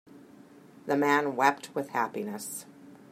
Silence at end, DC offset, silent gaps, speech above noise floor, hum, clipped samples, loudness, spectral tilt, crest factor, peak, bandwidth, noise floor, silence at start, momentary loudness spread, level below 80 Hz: 0.15 s; under 0.1%; none; 25 dB; none; under 0.1%; -29 LUFS; -4 dB/octave; 24 dB; -6 dBFS; 16 kHz; -53 dBFS; 0.1 s; 14 LU; -82 dBFS